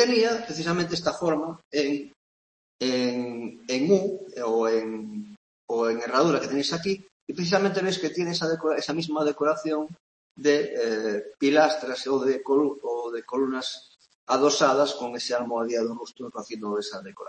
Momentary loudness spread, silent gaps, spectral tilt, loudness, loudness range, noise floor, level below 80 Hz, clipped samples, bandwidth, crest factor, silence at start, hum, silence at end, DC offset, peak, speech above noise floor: 12 LU; 1.65-1.71 s, 2.16-2.79 s, 5.37-5.68 s, 7.12-7.27 s, 10.00-10.35 s, 14.15-14.27 s; -4.5 dB/octave; -26 LUFS; 2 LU; under -90 dBFS; -70 dBFS; under 0.1%; 8.8 kHz; 20 dB; 0 s; none; 0 s; under 0.1%; -6 dBFS; over 65 dB